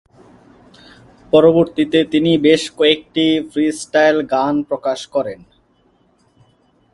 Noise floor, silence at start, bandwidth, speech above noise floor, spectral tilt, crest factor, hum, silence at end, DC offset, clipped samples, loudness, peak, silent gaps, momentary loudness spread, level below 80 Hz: -57 dBFS; 1.35 s; 11.5 kHz; 42 dB; -5 dB/octave; 18 dB; none; 1.6 s; under 0.1%; under 0.1%; -15 LUFS; 0 dBFS; none; 9 LU; -54 dBFS